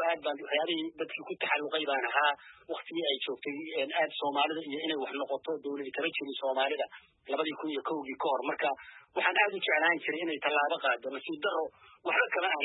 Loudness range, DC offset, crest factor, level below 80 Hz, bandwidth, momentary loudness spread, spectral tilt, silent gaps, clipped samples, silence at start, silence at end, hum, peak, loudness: 4 LU; under 0.1%; 18 dB; -84 dBFS; 4.1 kHz; 10 LU; -6.5 dB/octave; none; under 0.1%; 0 s; 0 s; none; -14 dBFS; -32 LUFS